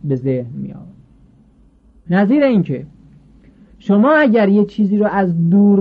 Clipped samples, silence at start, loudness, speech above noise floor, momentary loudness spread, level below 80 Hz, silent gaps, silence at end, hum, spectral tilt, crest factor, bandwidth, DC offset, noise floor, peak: under 0.1%; 0.05 s; -14 LUFS; 36 dB; 16 LU; -52 dBFS; none; 0 s; none; -10 dB/octave; 12 dB; 5 kHz; under 0.1%; -49 dBFS; -4 dBFS